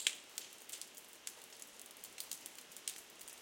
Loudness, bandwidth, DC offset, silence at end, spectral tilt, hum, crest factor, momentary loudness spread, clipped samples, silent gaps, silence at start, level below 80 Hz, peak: -48 LUFS; 17 kHz; under 0.1%; 0 s; 2 dB/octave; none; 36 dB; 6 LU; under 0.1%; none; 0 s; under -90 dBFS; -14 dBFS